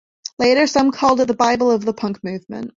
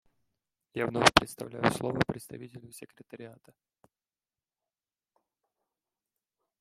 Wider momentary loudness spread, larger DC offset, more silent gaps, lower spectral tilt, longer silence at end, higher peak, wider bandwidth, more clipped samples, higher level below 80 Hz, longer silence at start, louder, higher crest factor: second, 13 LU vs 26 LU; neither; neither; about the same, -4.5 dB/octave vs -4 dB/octave; second, 0.1 s vs 3.25 s; about the same, -2 dBFS vs -2 dBFS; second, 7.6 kHz vs 16 kHz; neither; about the same, -54 dBFS vs -58 dBFS; second, 0.4 s vs 0.75 s; first, -17 LUFS vs -27 LUFS; second, 16 dB vs 32 dB